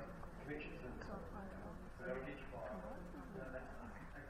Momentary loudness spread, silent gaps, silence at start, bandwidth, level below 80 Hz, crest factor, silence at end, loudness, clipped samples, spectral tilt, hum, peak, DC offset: 6 LU; none; 0 s; 16 kHz; -58 dBFS; 16 dB; 0 s; -51 LUFS; under 0.1%; -7 dB/octave; none; -34 dBFS; under 0.1%